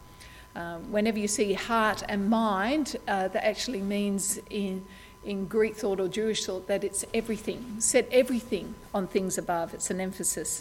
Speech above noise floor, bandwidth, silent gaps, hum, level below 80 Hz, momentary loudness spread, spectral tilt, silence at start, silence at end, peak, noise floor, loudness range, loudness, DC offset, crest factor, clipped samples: 20 dB; 17 kHz; none; none; -54 dBFS; 10 LU; -3.5 dB/octave; 0 s; 0 s; -10 dBFS; -49 dBFS; 3 LU; -28 LUFS; under 0.1%; 18 dB; under 0.1%